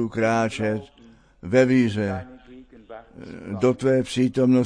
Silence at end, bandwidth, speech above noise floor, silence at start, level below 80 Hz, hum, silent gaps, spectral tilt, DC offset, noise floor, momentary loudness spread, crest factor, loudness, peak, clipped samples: 0 s; 10.5 kHz; 28 dB; 0 s; -54 dBFS; none; none; -6.5 dB/octave; under 0.1%; -49 dBFS; 23 LU; 16 dB; -22 LUFS; -6 dBFS; under 0.1%